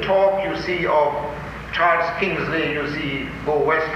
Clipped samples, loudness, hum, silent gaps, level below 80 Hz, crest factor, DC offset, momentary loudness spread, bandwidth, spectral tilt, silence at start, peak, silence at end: under 0.1%; -21 LUFS; none; none; -42 dBFS; 14 dB; under 0.1%; 9 LU; 14 kHz; -6 dB/octave; 0 s; -6 dBFS; 0 s